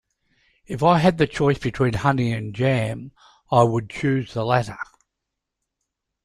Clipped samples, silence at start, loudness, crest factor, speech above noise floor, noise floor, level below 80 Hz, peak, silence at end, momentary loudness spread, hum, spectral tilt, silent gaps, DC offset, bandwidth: under 0.1%; 0.7 s; -21 LUFS; 20 dB; 61 dB; -82 dBFS; -50 dBFS; -4 dBFS; 1.4 s; 14 LU; none; -7 dB/octave; none; under 0.1%; 12 kHz